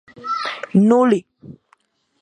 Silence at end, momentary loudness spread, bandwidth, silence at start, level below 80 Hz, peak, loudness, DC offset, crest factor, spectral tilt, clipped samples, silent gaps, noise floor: 0.7 s; 10 LU; 9.6 kHz; 0.2 s; -66 dBFS; -4 dBFS; -17 LUFS; under 0.1%; 16 dB; -7.5 dB/octave; under 0.1%; none; -60 dBFS